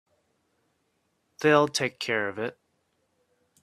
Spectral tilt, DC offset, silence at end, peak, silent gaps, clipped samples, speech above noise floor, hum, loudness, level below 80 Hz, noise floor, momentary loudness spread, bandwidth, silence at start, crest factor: -4 dB/octave; under 0.1%; 1.1 s; -6 dBFS; none; under 0.1%; 49 dB; none; -26 LUFS; -72 dBFS; -74 dBFS; 13 LU; 14 kHz; 1.4 s; 24 dB